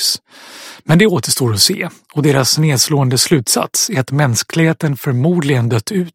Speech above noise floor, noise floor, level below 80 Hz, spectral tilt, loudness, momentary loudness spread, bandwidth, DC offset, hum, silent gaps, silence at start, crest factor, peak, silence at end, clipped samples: 23 dB; -37 dBFS; -52 dBFS; -4 dB/octave; -14 LUFS; 8 LU; 16.5 kHz; under 0.1%; none; none; 0 s; 14 dB; 0 dBFS; 0.05 s; under 0.1%